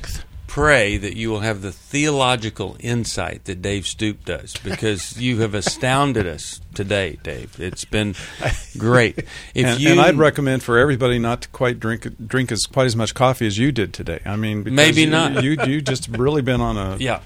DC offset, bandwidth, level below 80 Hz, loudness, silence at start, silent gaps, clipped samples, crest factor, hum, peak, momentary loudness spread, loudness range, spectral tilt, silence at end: under 0.1%; 16 kHz; -38 dBFS; -19 LUFS; 0 s; none; under 0.1%; 20 dB; none; 0 dBFS; 14 LU; 6 LU; -5 dB/octave; 0 s